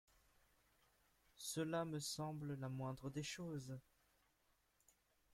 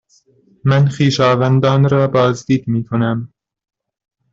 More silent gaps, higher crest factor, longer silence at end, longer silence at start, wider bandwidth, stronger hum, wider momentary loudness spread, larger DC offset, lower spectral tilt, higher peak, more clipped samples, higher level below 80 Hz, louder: neither; first, 20 dB vs 14 dB; first, 1.55 s vs 1.05 s; first, 1.35 s vs 0.65 s; first, 16.5 kHz vs 7.6 kHz; neither; about the same, 8 LU vs 7 LU; neither; second, -4.5 dB/octave vs -7 dB/octave; second, -30 dBFS vs -2 dBFS; neither; second, -76 dBFS vs -50 dBFS; second, -47 LUFS vs -15 LUFS